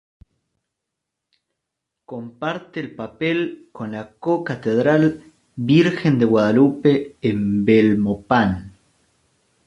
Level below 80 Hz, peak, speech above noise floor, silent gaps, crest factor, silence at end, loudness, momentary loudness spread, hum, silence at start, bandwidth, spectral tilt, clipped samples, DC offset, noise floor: -50 dBFS; -2 dBFS; 63 dB; none; 18 dB; 0.95 s; -19 LUFS; 16 LU; none; 2.1 s; 9.2 kHz; -8 dB/octave; under 0.1%; under 0.1%; -81 dBFS